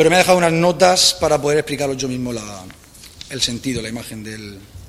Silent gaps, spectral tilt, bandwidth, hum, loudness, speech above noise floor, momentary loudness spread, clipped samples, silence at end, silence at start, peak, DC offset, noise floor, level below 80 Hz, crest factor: none; -3.5 dB/octave; 16 kHz; none; -16 LUFS; 22 dB; 20 LU; under 0.1%; 0 s; 0 s; 0 dBFS; under 0.1%; -40 dBFS; -46 dBFS; 18 dB